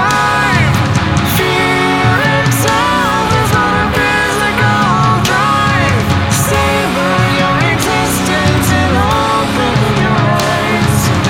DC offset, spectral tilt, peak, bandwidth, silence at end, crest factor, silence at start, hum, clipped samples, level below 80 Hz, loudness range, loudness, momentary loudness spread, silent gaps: under 0.1%; -4.5 dB/octave; 0 dBFS; 17 kHz; 0 s; 10 dB; 0 s; none; under 0.1%; -30 dBFS; 1 LU; -11 LUFS; 2 LU; none